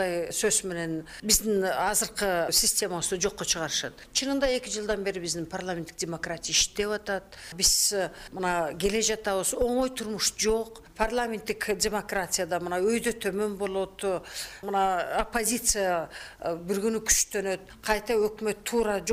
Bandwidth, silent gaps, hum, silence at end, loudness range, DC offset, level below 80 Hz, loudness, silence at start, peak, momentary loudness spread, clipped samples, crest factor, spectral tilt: 16 kHz; none; none; 0 s; 3 LU; under 0.1%; -48 dBFS; -27 LUFS; 0 s; -8 dBFS; 10 LU; under 0.1%; 20 dB; -2 dB/octave